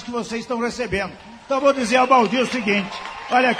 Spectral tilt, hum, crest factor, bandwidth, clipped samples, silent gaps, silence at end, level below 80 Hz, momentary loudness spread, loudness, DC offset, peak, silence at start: -4 dB/octave; none; 18 dB; 13.5 kHz; under 0.1%; none; 0 s; -50 dBFS; 11 LU; -20 LUFS; under 0.1%; -2 dBFS; 0 s